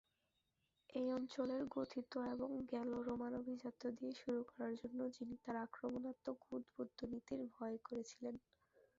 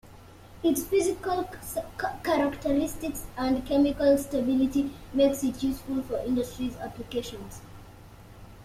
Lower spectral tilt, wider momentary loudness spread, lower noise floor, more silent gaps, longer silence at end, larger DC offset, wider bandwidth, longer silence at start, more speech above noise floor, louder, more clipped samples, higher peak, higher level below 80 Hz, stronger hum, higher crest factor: about the same, -5 dB/octave vs -5 dB/octave; second, 7 LU vs 11 LU; first, -87 dBFS vs -49 dBFS; neither; first, 0.6 s vs 0 s; neither; second, 7.6 kHz vs 16 kHz; first, 0.9 s vs 0.05 s; first, 41 dB vs 22 dB; second, -47 LUFS vs -28 LUFS; neither; second, -32 dBFS vs -10 dBFS; second, -78 dBFS vs -48 dBFS; neither; about the same, 16 dB vs 18 dB